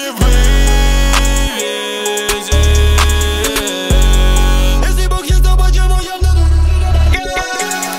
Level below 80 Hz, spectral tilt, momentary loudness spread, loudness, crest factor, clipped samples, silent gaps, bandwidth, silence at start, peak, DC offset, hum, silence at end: -12 dBFS; -4 dB/octave; 5 LU; -13 LUFS; 10 dB; under 0.1%; none; 16.5 kHz; 0 s; 0 dBFS; under 0.1%; none; 0 s